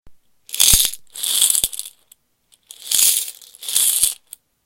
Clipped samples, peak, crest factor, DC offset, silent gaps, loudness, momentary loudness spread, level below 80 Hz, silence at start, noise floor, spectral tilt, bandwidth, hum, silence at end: under 0.1%; 0 dBFS; 20 dB; under 0.1%; none; -15 LUFS; 19 LU; -40 dBFS; 0.05 s; -60 dBFS; 1.5 dB/octave; over 20 kHz; none; 0.5 s